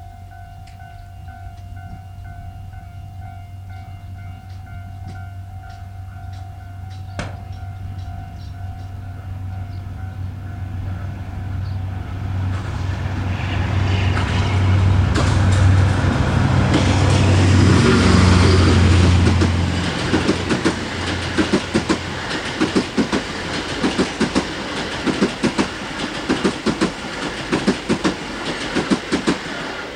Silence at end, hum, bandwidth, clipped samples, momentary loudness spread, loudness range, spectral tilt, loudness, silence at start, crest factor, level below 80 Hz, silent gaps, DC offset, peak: 0 s; none; 10.5 kHz; under 0.1%; 21 LU; 20 LU; -6 dB/octave; -19 LUFS; 0 s; 18 dB; -32 dBFS; none; under 0.1%; 0 dBFS